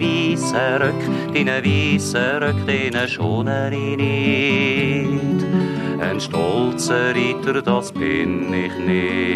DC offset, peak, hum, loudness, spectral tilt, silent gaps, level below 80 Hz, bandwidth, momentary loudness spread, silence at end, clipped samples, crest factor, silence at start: under 0.1%; -4 dBFS; none; -19 LUFS; -5.5 dB/octave; none; -54 dBFS; 13.5 kHz; 4 LU; 0 s; under 0.1%; 14 dB; 0 s